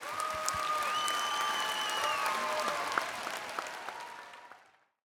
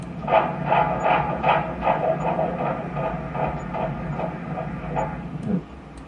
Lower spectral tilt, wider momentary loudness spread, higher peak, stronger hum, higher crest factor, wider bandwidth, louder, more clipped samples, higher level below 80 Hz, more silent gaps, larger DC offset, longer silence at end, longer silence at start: second, 0 dB/octave vs -8 dB/octave; first, 13 LU vs 9 LU; second, -8 dBFS vs -4 dBFS; neither; first, 26 dB vs 20 dB; first, over 20 kHz vs 9.6 kHz; second, -33 LUFS vs -24 LUFS; neither; second, -70 dBFS vs -42 dBFS; neither; neither; first, 0.5 s vs 0 s; about the same, 0 s vs 0 s